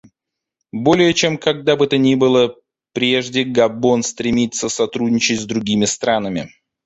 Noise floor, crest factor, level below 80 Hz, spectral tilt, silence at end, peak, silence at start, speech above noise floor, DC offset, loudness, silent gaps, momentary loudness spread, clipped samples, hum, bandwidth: -82 dBFS; 16 dB; -52 dBFS; -4 dB/octave; 0.4 s; -2 dBFS; 0.75 s; 66 dB; under 0.1%; -17 LUFS; none; 7 LU; under 0.1%; none; 8.2 kHz